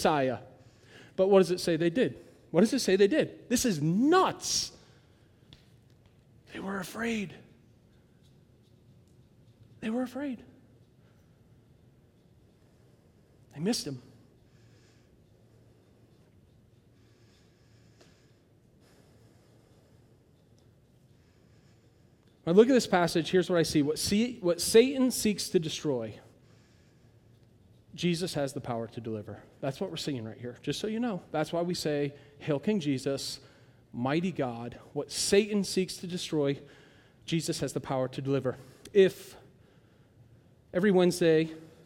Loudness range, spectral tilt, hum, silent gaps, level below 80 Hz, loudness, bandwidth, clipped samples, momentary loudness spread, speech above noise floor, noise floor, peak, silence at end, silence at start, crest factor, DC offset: 14 LU; -5 dB/octave; none; none; -64 dBFS; -29 LUFS; 17.5 kHz; under 0.1%; 16 LU; 34 dB; -62 dBFS; -8 dBFS; 0.2 s; 0 s; 24 dB; under 0.1%